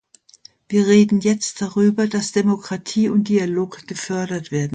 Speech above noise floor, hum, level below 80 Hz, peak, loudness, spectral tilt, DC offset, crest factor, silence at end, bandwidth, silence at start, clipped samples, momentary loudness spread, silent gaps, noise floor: 31 dB; none; -60 dBFS; -2 dBFS; -19 LUFS; -5.5 dB/octave; under 0.1%; 16 dB; 0 s; 9.4 kHz; 0.7 s; under 0.1%; 10 LU; none; -49 dBFS